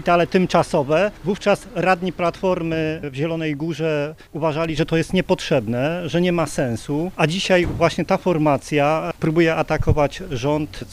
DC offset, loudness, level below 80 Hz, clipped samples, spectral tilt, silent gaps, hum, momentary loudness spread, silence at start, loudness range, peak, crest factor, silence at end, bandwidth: under 0.1%; -20 LUFS; -38 dBFS; under 0.1%; -6 dB/octave; none; none; 6 LU; 0 s; 3 LU; -2 dBFS; 18 dB; 0 s; 15.5 kHz